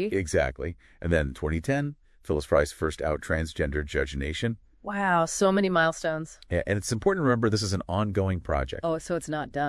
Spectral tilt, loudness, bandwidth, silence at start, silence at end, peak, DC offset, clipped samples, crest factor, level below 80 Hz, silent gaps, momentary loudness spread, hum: -5.5 dB/octave; -27 LUFS; 12 kHz; 0 s; 0 s; -8 dBFS; under 0.1%; under 0.1%; 20 dB; -42 dBFS; none; 8 LU; none